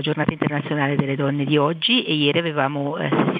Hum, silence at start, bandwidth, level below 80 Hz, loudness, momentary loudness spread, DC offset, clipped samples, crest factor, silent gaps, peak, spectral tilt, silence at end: none; 0 s; 5 kHz; -58 dBFS; -20 LUFS; 5 LU; under 0.1%; under 0.1%; 18 dB; none; -2 dBFS; -9 dB/octave; 0 s